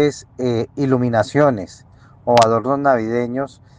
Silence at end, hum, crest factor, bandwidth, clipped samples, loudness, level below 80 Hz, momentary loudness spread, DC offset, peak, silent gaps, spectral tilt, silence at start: 0.3 s; none; 18 dB; 9.8 kHz; under 0.1%; -18 LUFS; -54 dBFS; 12 LU; under 0.1%; 0 dBFS; none; -6.5 dB/octave; 0 s